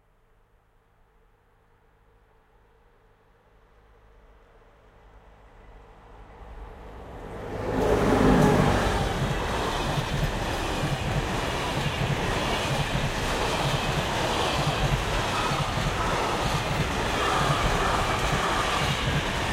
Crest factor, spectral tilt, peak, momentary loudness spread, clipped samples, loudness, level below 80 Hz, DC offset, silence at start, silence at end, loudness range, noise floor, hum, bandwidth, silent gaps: 20 dB; -5 dB/octave; -8 dBFS; 7 LU; under 0.1%; -25 LUFS; -36 dBFS; under 0.1%; 5.15 s; 0 s; 3 LU; -62 dBFS; none; 16.5 kHz; none